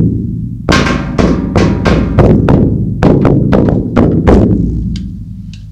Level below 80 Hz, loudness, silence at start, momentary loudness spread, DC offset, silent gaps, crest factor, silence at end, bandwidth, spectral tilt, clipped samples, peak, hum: -18 dBFS; -10 LUFS; 0 s; 11 LU; under 0.1%; none; 10 dB; 0 s; 10.5 kHz; -7.5 dB/octave; 1%; 0 dBFS; none